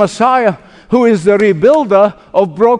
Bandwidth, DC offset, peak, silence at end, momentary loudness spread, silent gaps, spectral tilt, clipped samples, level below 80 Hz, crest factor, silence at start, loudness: 10.5 kHz; under 0.1%; 0 dBFS; 0 s; 6 LU; none; -6.5 dB/octave; 0.4%; -48 dBFS; 10 dB; 0 s; -11 LUFS